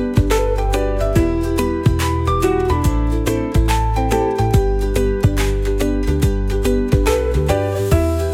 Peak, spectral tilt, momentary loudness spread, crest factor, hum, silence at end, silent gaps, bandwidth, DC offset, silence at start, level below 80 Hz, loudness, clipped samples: -2 dBFS; -6.5 dB/octave; 3 LU; 14 dB; none; 0 s; none; 16.5 kHz; under 0.1%; 0 s; -20 dBFS; -18 LUFS; under 0.1%